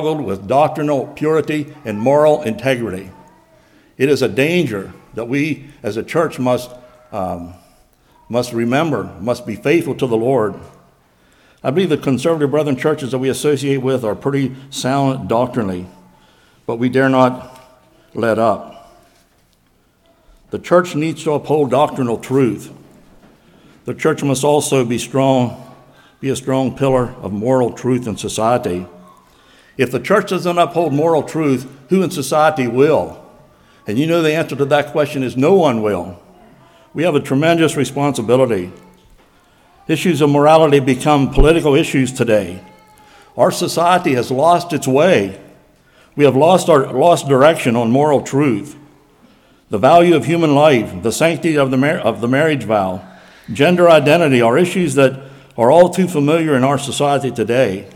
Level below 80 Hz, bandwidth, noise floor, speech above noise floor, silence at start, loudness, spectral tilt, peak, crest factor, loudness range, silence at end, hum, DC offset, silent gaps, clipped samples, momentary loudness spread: -36 dBFS; 17 kHz; -56 dBFS; 42 dB; 0 s; -15 LUFS; -6 dB/octave; 0 dBFS; 16 dB; 6 LU; 0.05 s; none; under 0.1%; none; under 0.1%; 13 LU